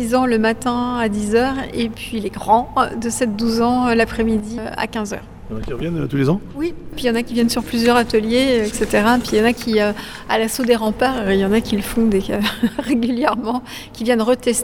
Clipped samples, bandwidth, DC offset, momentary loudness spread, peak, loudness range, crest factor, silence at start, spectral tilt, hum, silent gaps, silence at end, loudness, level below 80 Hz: under 0.1%; 17.5 kHz; under 0.1%; 10 LU; -2 dBFS; 4 LU; 16 dB; 0 s; -5 dB/octave; none; none; 0 s; -18 LUFS; -38 dBFS